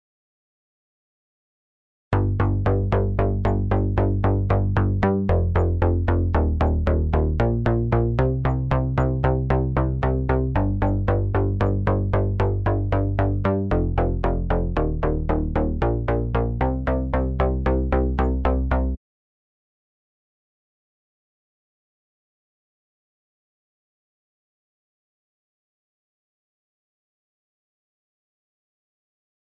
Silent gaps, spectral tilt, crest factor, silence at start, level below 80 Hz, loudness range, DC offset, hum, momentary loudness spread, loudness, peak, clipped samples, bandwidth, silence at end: none; -10.5 dB/octave; 18 dB; 2.1 s; -28 dBFS; 4 LU; 0.1%; none; 3 LU; -22 LUFS; -6 dBFS; under 0.1%; 4.8 kHz; 10.5 s